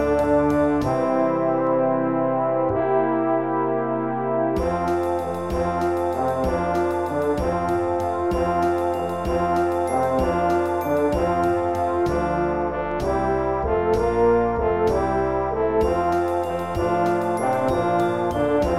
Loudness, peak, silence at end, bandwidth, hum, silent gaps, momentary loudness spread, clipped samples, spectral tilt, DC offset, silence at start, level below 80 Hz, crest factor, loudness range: -22 LUFS; -8 dBFS; 0 s; 14 kHz; none; none; 3 LU; under 0.1%; -7.5 dB/octave; 0.4%; 0 s; -38 dBFS; 14 dB; 2 LU